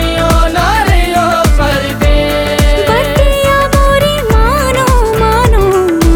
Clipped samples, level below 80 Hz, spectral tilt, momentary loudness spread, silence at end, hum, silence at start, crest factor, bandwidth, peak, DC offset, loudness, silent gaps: under 0.1%; -14 dBFS; -5 dB/octave; 2 LU; 0 s; none; 0 s; 8 dB; 19 kHz; 0 dBFS; under 0.1%; -10 LUFS; none